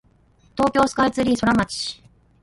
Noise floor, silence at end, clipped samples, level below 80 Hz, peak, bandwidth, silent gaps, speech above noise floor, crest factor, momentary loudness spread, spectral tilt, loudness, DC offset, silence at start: -57 dBFS; 0.5 s; under 0.1%; -46 dBFS; -4 dBFS; 11.5 kHz; none; 37 dB; 18 dB; 13 LU; -4.5 dB/octave; -20 LUFS; under 0.1%; 0.55 s